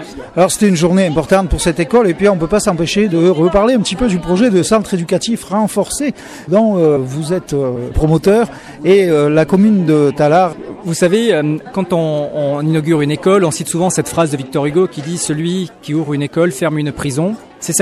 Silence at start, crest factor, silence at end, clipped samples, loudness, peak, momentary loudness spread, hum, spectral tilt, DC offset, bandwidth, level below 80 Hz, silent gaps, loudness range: 0 s; 12 dB; 0 s; under 0.1%; -14 LUFS; -2 dBFS; 7 LU; none; -5.5 dB/octave; under 0.1%; 14 kHz; -32 dBFS; none; 3 LU